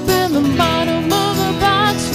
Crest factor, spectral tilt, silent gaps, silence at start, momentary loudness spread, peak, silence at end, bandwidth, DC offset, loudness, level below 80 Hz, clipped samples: 14 dB; -4.5 dB/octave; none; 0 s; 2 LU; -2 dBFS; 0 s; 16 kHz; under 0.1%; -15 LUFS; -36 dBFS; under 0.1%